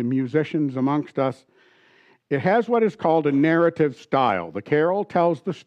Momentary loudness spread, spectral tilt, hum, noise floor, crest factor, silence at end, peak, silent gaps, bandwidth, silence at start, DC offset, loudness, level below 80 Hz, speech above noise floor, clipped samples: 7 LU; -8.5 dB/octave; none; -57 dBFS; 14 dB; 0.05 s; -8 dBFS; none; 8.6 kHz; 0 s; under 0.1%; -22 LUFS; -70 dBFS; 36 dB; under 0.1%